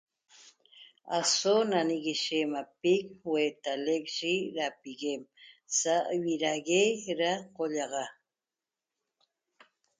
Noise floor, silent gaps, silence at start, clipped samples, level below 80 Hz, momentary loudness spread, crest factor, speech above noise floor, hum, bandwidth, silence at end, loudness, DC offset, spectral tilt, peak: under -90 dBFS; none; 0.75 s; under 0.1%; -80 dBFS; 10 LU; 18 dB; over 60 dB; none; 9.6 kHz; 1.9 s; -30 LUFS; under 0.1%; -2.5 dB/octave; -14 dBFS